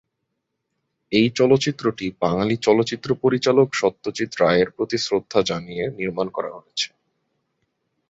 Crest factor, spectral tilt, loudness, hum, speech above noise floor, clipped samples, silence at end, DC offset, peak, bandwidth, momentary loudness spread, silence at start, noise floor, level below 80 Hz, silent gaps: 18 dB; -5 dB/octave; -21 LUFS; none; 57 dB; under 0.1%; 1.25 s; under 0.1%; -4 dBFS; 8 kHz; 9 LU; 1.1 s; -77 dBFS; -56 dBFS; none